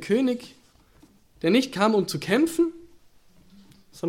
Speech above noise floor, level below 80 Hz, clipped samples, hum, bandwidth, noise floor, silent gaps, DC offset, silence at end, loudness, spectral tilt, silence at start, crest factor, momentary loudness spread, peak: 34 dB; -62 dBFS; under 0.1%; none; 16.5 kHz; -56 dBFS; none; under 0.1%; 0 s; -24 LUFS; -5 dB/octave; 0 s; 18 dB; 6 LU; -8 dBFS